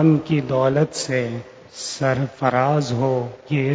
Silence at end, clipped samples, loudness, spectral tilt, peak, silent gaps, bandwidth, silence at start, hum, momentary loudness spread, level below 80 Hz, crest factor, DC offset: 0 s; under 0.1%; -21 LUFS; -6 dB/octave; -2 dBFS; none; 8 kHz; 0 s; none; 11 LU; -54 dBFS; 18 dB; under 0.1%